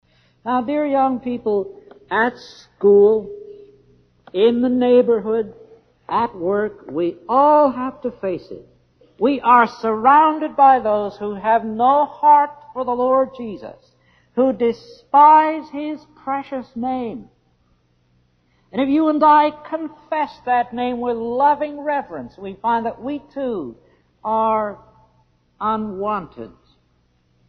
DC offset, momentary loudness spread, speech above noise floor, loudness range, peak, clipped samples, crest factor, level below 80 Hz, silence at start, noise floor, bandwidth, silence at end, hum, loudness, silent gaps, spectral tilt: under 0.1%; 17 LU; 44 dB; 8 LU; -2 dBFS; under 0.1%; 16 dB; -58 dBFS; 0.45 s; -61 dBFS; 6.4 kHz; 1 s; none; -18 LUFS; none; -7.5 dB/octave